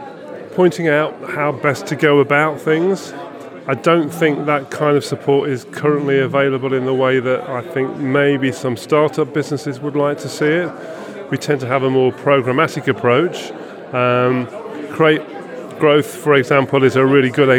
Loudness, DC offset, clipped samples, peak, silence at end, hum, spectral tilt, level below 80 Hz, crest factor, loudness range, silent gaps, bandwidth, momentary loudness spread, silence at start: -16 LUFS; under 0.1%; under 0.1%; 0 dBFS; 0 s; none; -6 dB/octave; -72 dBFS; 16 dB; 2 LU; none; 16 kHz; 14 LU; 0 s